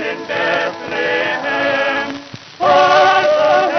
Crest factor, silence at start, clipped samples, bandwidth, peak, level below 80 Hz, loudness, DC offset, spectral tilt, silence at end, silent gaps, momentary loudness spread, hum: 14 dB; 0 s; under 0.1%; 6.6 kHz; 0 dBFS; -70 dBFS; -14 LUFS; under 0.1%; -3.5 dB/octave; 0 s; none; 10 LU; none